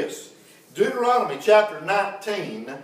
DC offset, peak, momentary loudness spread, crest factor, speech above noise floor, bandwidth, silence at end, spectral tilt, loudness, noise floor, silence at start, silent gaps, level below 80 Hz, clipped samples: under 0.1%; -4 dBFS; 15 LU; 20 dB; 28 dB; 16 kHz; 0 s; -4 dB/octave; -22 LUFS; -50 dBFS; 0 s; none; -84 dBFS; under 0.1%